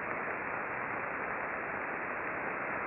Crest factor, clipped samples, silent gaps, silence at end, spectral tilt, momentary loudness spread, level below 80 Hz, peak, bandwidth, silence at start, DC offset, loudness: 18 dB; under 0.1%; none; 0 s; -5 dB/octave; 0 LU; -66 dBFS; -18 dBFS; 5.2 kHz; 0 s; under 0.1%; -36 LUFS